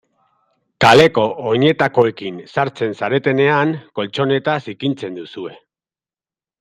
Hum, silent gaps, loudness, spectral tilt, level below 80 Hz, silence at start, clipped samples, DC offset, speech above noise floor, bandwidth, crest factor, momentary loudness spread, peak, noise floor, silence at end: none; none; -16 LUFS; -6 dB/octave; -56 dBFS; 0.8 s; under 0.1%; under 0.1%; over 74 dB; 13.5 kHz; 18 dB; 17 LU; 0 dBFS; under -90 dBFS; 1.05 s